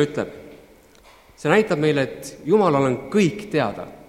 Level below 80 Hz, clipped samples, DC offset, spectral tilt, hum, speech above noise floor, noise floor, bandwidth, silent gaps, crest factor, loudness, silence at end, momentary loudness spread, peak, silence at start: -56 dBFS; under 0.1%; under 0.1%; -6 dB/octave; none; 30 dB; -50 dBFS; 15 kHz; none; 20 dB; -21 LUFS; 0.1 s; 12 LU; 0 dBFS; 0 s